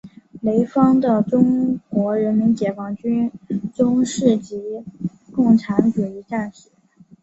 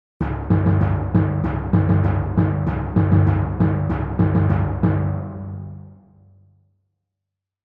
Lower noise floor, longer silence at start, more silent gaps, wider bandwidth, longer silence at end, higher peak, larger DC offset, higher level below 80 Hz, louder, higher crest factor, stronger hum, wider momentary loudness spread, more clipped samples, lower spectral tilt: second, -50 dBFS vs -83 dBFS; second, 0.05 s vs 0.2 s; neither; first, 8.2 kHz vs 3.6 kHz; second, 0.7 s vs 1.7 s; about the same, -2 dBFS vs -4 dBFS; neither; second, -56 dBFS vs -34 dBFS; about the same, -19 LUFS vs -20 LUFS; about the same, 18 dB vs 16 dB; neither; about the same, 13 LU vs 12 LU; neither; second, -7.5 dB/octave vs -12 dB/octave